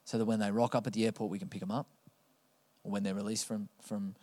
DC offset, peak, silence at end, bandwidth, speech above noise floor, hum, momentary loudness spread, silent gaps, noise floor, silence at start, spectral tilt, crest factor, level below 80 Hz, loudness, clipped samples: under 0.1%; -16 dBFS; 0.1 s; 15 kHz; 37 dB; none; 10 LU; none; -71 dBFS; 0.05 s; -5.5 dB/octave; 20 dB; -84 dBFS; -35 LUFS; under 0.1%